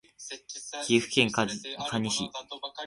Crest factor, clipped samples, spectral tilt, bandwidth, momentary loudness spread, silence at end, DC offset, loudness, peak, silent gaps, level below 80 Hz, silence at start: 22 dB; under 0.1%; -3 dB/octave; 11.5 kHz; 14 LU; 0 s; under 0.1%; -29 LUFS; -8 dBFS; none; -64 dBFS; 0.2 s